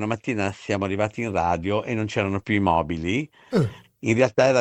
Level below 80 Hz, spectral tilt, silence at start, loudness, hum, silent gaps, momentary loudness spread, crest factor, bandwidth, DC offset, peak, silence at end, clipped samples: -50 dBFS; -6.5 dB/octave; 0 s; -24 LUFS; none; none; 6 LU; 20 dB; 10.5 kHz; under 0.1%; -4 dBFS; 0 s; under 0.1%